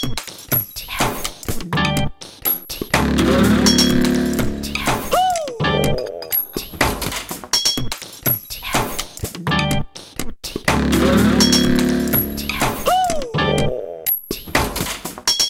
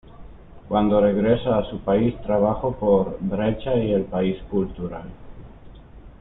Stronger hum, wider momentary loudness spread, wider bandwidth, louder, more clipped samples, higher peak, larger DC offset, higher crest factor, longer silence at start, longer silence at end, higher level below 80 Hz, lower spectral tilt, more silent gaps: neither; first, 12 LU vs 9 LU; first, 17 kHz vs 4 kHz; first, -18 LUFS vs -22 LUFS; neither; first, 0 dBFS vs -6 dBFS; neither; about the same, 18 dB vs 18 dB; about the same, 0 s vs 0.05 s; about the same, 0 s vs 0.05 s; first, -32 dBFS vs -42 dBFS; second, -4 dB/octave vs -12 dB/octave; neither